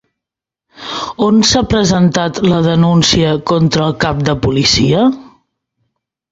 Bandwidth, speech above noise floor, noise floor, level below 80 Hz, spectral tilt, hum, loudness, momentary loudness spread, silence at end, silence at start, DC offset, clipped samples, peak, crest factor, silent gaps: 8 kHz; 73 dB; -84 dBFS; -34 dBFS; -5 dB/octave; none; -12 LUFS; 8 LU; 1.1 s; 0.8 s; under 0.1%; under 0.1%; 0 dBFS; 14 dB; none